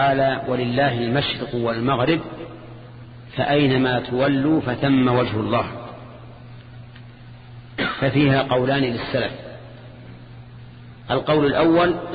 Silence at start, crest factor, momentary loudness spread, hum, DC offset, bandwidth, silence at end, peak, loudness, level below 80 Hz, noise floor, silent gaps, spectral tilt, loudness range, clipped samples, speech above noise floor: 0 s; 16 dB; 24 LU; none; under 0.1%; 5 kHz; 0 s; -6 dBFS; -20 LUFS; -48 dBFS; -41 dBFS; none; -9.5 dB/octave; 4 LU; under 0.1%; 22 dB